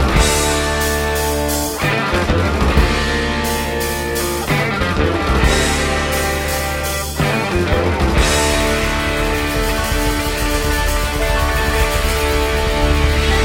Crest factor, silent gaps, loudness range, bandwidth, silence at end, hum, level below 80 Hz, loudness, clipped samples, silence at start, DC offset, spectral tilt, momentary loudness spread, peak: 16 dB; none; 1 LU; 16.5 kHz; 0 s; none; -20 dBFS; -16 LUFS; under 0.1%; 0 s; under 0.1%; -4 dB/octave; 4 LU; 0 dBFS